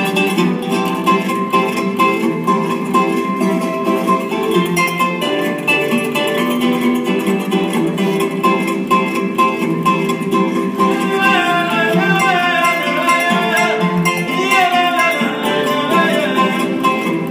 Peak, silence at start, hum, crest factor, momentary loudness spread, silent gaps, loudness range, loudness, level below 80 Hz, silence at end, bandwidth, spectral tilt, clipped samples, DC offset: -2 dBFS; 0 s; none; 12 dB; 4 LU; none; 2 LU; -15 LUFS; -60 dBFS; 0 s; 16 kHz; -5 dB/octave; under 0.1%; under 0.1%